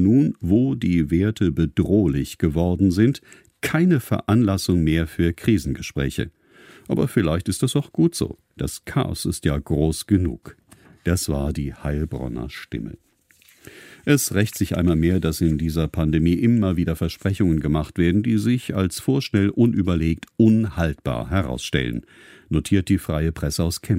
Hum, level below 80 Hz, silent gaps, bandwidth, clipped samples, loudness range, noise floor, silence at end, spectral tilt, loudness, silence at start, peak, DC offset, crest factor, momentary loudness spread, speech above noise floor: none; -36 dBFS; none; 16 kHz; under 0.1%; 5 LU; -56 dBFS; 0 s; -6.5 dB/octave; -21 LUFS; 0 s; -4 dBFS; under 0.1%; 18 dB; 9 LU; 36 dB